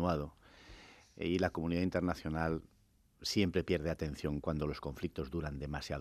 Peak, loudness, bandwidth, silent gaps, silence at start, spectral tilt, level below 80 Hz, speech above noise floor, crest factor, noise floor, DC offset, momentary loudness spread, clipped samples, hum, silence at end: -16 dBFS; -37 LUFS; 14.5 kHz; none; 0 s; -6 dB/octave; -54 dBFS; 31 dB; 22 dB; -67 dBFS; under 0.1%; 13 LU; under 0.1%; none; 0 s